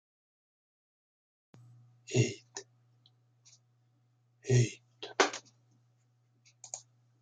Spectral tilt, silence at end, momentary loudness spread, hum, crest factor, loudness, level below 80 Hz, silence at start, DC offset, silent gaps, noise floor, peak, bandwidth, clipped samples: -4.5 dB/octave; 0.4 s; 18 LU; none; 28 dB; -33 LUFS; -72 dBFS; 2.1 s; under 0.1%; none; -71 dBFS; -10 dBFS; 9.4 kHz; under 0.1%